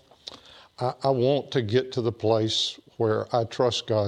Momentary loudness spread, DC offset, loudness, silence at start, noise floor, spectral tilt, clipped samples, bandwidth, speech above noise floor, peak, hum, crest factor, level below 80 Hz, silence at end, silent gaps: 8 LU; under 0.1%; -25 LUFS; 0.25 s; -49 dBFS; -5.5 dB/octave; under 0.1%; 10.5 kHz; 24 dB; -10 dBFS; none; 16 dB; -64 dBFS; 0 s; none